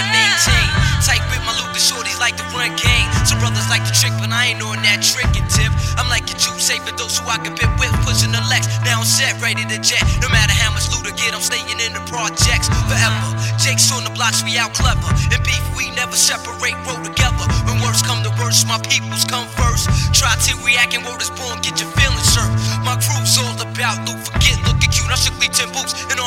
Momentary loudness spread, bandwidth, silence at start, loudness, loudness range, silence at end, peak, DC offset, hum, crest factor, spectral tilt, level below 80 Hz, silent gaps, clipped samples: 6 LU; 16.5 kHz; 0 s; -15 LUFS; 2 LU; 0 s; 0 dBFS; under 0.1%; none; 16 dB; -2.5 dB/octave; -26 dBFS; none; under 0.1%